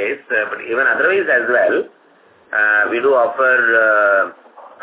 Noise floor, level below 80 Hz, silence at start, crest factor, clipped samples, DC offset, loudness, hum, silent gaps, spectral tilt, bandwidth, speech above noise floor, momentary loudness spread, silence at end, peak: -50 dBFS; -68 dBFS; 0 s; 14 dB; under 0.1%; under 0.1%; -15 LUFS; none; none; -7 dB/octave; 4 kHz; 35 dB; 8 LU; 0.15 s; -2 dBFS